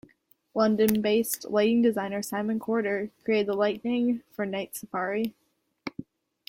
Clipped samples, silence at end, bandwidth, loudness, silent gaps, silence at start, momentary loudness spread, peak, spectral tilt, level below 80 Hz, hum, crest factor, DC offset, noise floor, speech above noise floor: under 0.1%; 0.45 s; 16.5 kHz; -27 LUFS; none; 0.55 s; 12 LU; -6 dBFS; -5 dB/octave; -66 dBFS; none; 22 dB; under 0.1%; -63 dBFS; 37 dB